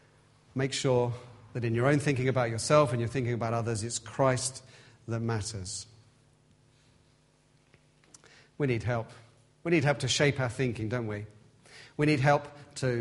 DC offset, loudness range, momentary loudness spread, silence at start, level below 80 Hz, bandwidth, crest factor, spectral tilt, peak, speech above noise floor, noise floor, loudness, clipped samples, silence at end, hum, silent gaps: under 0.1%; 11 LU; 15 LU; 0.55 s; -60 dBFS; 11.5 kHz; 22 dB; -5 dB/octave; -8 dBFS; 36 dB; -65 dBFS; -29 LUFS; under 0.1%; 0 s; none; none